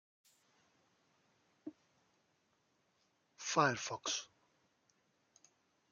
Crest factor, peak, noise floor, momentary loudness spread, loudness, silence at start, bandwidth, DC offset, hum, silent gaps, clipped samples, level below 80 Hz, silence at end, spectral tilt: 26 dB; -18 dBFS; -79 dBFS; 22 LU; -37 LUFS; 1.65 s; 11.5 kHz; under 0.1%; none; none; under 0.1%; -86 dBFS; 1.65 s; -2.5 dB/octave